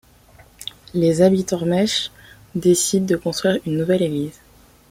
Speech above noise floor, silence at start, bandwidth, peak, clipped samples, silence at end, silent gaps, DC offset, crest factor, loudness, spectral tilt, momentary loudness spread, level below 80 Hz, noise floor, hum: 31 dB; 0.6 s; 16 kHz; -4 dBFS; under 0.1%; 0.6 s; none; under 0.1%; 18 dB; -19 LUFS; -5 dB/octave; 15 LU; -52 dBFS; -49 dBFS; none